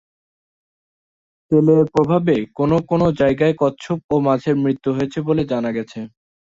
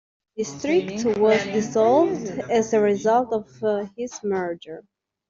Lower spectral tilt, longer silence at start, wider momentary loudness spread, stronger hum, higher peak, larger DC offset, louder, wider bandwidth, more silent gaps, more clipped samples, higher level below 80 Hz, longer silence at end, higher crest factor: first, -8.5 dB/octave vs -5 dB/octave; first, 1.5 s vs 0.35 s; second, 10 LU vs 13 LU; neither; first, -2 dBFS vs -6 dBFS; neither; first, -18 LUFS vs -22 LUFS; about the same, 7.8 kHz vs 7.6 kHz; first, 4.04-4.09 s vs none; neither; first, -50 dBFS vs -62 dBFS; about the same, 0.45 s vs 0.5 s; about the same, 16 dB vs 16 dB